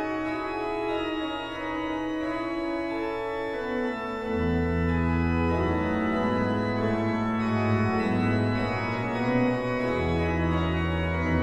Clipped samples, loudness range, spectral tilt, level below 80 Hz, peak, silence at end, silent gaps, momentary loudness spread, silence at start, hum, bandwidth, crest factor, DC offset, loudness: under 0.1%; 4 LU; -8 dB/octave; -40 dBFS; -14 dBFS; 0 s; none; 5 LU; 0 s; none; 9.8 kHz; 14 dB; under 0.1%; -27 LUFS